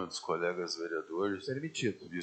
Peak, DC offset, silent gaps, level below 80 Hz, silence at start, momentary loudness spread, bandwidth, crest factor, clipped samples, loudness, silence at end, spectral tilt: -18 dBFS; under 0.1%; none; -80 dBFS; 0 s; 3 LU; 9 kHz; 18 dB; under 0.1%; -36 LUFS; 0 s; -4.5 dB/octave